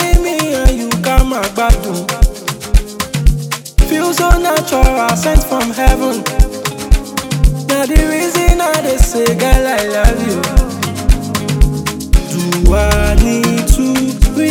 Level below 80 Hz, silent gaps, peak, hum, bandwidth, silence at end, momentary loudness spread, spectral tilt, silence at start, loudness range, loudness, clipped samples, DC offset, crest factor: -14 dBFS; none; 0 dBFS; none; 18.5 kHz; 0 s; 5 LU; -5 dB/octave; 0 s; 2 LU; -14 LUFS; 1%; 0.3%; 12 dB